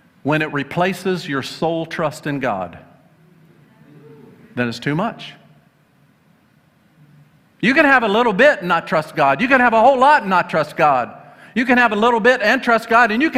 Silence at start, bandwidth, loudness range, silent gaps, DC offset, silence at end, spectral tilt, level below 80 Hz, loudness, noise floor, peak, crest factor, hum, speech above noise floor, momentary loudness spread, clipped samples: 0.25 s; 15.5 kHz; 14 LU; none; under 0.1%; 0 s; -5.5 dB/octave; -56 dBFS; -16 LUFS; -56 dBFS; 0 dBFS; 16 dB; none; 39 dB; 12 LU; under 0.1%